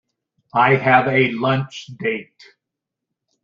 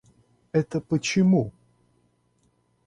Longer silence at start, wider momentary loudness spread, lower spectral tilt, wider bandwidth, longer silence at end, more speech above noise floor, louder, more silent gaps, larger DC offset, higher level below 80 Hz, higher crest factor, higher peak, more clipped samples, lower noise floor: about the same, 0.55 s vs 0.55 s; first, 12 LU vs 7 LU; about the same, -6.5 dB/octave vs -6 dB/octave; second, 7.4 kHz vs 10 kHz; second, 1.2 s vs 1.35 s; first, 65 dB vs 45 dB; first, -17 LUFS vs -24 LUFS; neither; neither; about the same, -60 dBFS vs -60 dBFS; about the same, 18 dB vs 18 dB; first, -2 dBFS vs -10 dBFS; neither; first, -83 dBFS vs -67 dBFS